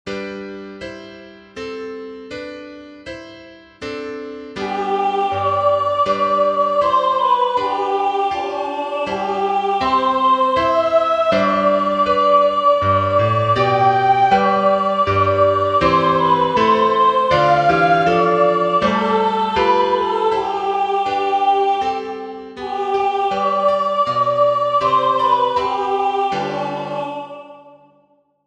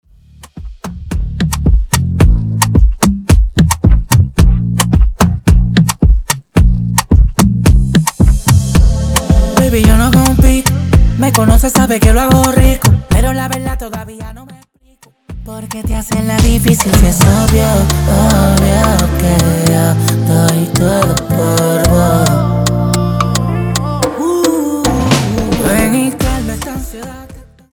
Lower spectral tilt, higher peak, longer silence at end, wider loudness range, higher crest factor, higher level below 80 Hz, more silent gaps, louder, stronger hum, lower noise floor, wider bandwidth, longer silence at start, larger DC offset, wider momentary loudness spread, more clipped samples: about the same, -6 dB/octave vs -5.5 dB/octave; about the same, 0 dBFS vs 0 dBFS; first, 0.75 s vs 0.3 s; first, 9 LU vs 4 LU; first, 16 dB vs 10 dB; second, -50 dBFS vs -16 dBFS; neither; second, -16 LUFS vs -11 LUFS; neither; first, -58 dBFS vs -47 dBFS; second, 9.2 kHz vs over 20 kHz; second, 0.05 s vs 0.55 s; neither; first, 16 LU vs 11 LU; neither